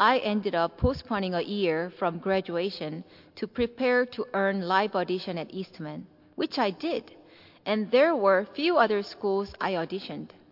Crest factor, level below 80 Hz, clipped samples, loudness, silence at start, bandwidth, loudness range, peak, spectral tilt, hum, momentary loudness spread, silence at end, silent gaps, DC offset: 20 dB; -52 dBFS; under 0.1%; -27 LUFS; 0 s; 5.8 kHz; 4 LU; -8 dBFS; -7 dB/octave; none; 15 LU; 0.25 s; none; under 0.1%